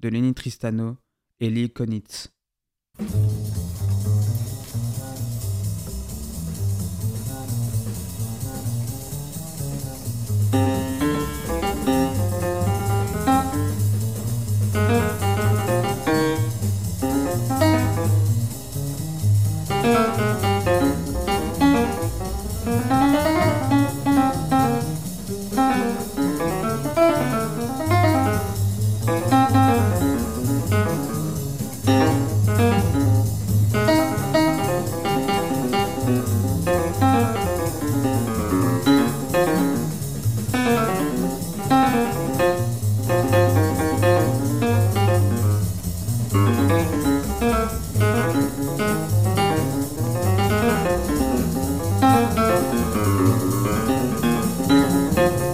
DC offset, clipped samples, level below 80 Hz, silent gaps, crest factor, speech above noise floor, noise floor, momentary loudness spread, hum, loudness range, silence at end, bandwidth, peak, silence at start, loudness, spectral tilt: 0.8%; under 0.1%; -40 dBFS; none; 14 dB; 61 dB; -84 dBFS; 10 LU; none; 7 LU; 0 s; 16 kHz; -6 dBFS; 0 s; -21 LUFS; -6 dB/octave